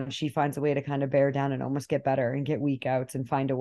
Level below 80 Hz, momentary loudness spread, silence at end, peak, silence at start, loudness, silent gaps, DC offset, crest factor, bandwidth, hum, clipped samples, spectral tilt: -66 dBFS; 5 LU; 0 s; -12 dBFS; 0 s; -28 LUFS; none; under 0.1%; 16 dB; 12.5 kHz; none; under 0.1%; -7 dB/octave